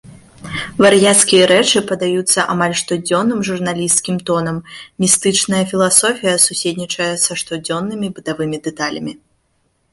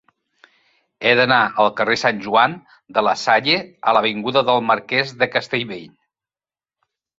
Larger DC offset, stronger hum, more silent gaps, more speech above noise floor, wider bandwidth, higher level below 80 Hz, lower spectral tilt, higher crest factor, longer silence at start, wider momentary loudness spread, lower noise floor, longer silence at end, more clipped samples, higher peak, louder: neither; neither; neither; second, 47 dB vs over 72 dB; first, 14 kHz vs 8 kHz; first, -52 dBFS vs -62 dBFS; about the same, -3 dB/octave vs -4 dB/octave; about the same, 16 dB vs 18 dB; second, 0.05 s vs 1 s; first, 13 LU vs 8 LU; second, -63 dBFS vs under -90 dBFS; second, 0.75 s vs 1.3 s; neither; about the same, 0 dBFS vs -2 dBFS; first, -14 LUFS vs -17 LUFS